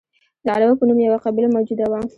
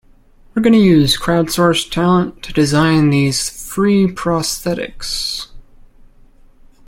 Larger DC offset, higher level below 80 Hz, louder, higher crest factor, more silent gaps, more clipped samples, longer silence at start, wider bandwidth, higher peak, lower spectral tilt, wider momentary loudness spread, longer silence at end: neither; second, -56 dBFS vs -38 dBFS; second, -18 LUFS vs -15 LUFS; about the same, 14 dB vs 14 dB; neither; neither; about the same, 0.45 s vs 0.55 s; second, 4.7 kHz vs 16.5 kHz; second, -4 dBFS vs 0 dBFS; first, -8.5 dB/octave vs -5 dB/octave; second, 6 LU vs 11 LU; second, 0.1 s vs 1.25 s